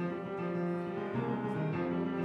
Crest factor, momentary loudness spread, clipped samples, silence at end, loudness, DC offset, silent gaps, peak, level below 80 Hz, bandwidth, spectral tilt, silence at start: 12 dB; 3 LU; under 0.1%; 0 s; -35 LUFS; under 0.1%; none; -24 dBFS; -68 dBFS; 6 kHz; -9.5 dB/octave; 0 s